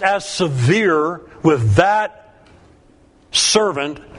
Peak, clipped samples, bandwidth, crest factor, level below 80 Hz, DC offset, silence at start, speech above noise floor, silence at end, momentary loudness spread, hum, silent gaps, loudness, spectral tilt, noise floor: 0 dBFS; under 0.1%; 11 kHz; 18 dB; -48 dBFS; under 0.1%; 0 s; 34 dB; 0 s; 7 LU; none; none; -16 LUFS; -4 dB/octave; -50 dBFS